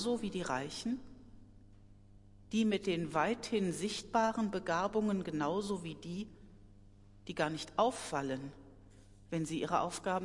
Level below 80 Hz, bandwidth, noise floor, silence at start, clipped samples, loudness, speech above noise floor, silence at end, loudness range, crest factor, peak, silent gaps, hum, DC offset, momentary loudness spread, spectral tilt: -62 dBFS; 11.5 kHz; -59 dBFS; 0 s; under 0.1%; -36 LUFS; 23 dB; 0 s; 5 LU; 20 dB; -18 dBFS; none; none; under 0.1%; 10 LU; -5 dB/octave